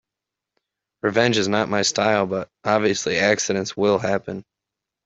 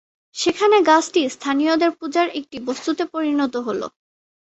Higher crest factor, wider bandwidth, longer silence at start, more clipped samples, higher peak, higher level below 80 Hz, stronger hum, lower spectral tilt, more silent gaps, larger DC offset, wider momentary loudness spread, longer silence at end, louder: about the same, 20 dB vs 18 dB; about the same, 8.2 kHz vs 8.2 kHz; first, 1.05 s vs 0.35 s; neither; about the same, -2 dBFS vs -2 dBFS; about the same, -62 dBFS vs -66 dBFS; neither; about the same, -3.5 dB/octave vs -3 dB/octave; neither; neither; second, 8 LU vs 13 LU; about the same, 0.65 s vs 0.55 s; about the same, -21 LUFS vs -20 LUFS